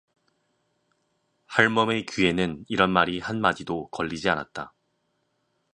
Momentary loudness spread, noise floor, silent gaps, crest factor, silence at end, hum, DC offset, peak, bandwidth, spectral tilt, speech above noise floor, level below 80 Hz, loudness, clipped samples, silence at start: 11 LU; -73 dBFS; none; 26 dB; 1.1 s; none; under 0.1%; -2 dBFS; 10.5 kHz; -5 dB/octave; 49 dB; -56 dBFS; -24 LUFS; under 0.1%; 1.5 s